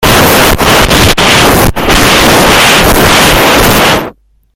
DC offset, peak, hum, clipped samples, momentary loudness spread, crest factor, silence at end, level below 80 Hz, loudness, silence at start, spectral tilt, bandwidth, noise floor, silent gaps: under 0.1%; 0 dBFS; none; 2%; 4 LU; 6 dB; 0.45 s; -18 dBFS; -4 LUFS; 0 s; -3 dB/octave; over 20 kHz; -28 dBFS; none